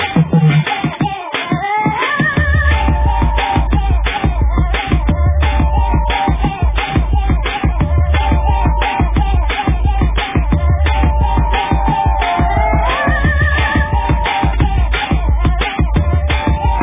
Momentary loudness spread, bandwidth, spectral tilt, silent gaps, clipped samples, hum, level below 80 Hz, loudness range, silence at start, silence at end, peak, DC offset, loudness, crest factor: 3 LU; 3.8 kHz; -10.5 dB/octave; none; under 0.1%; none; -16 dBFS; 1 LU; 0 s; 0 s; 0 dBFS; under 0.1%; -15 LUFS; 12 dB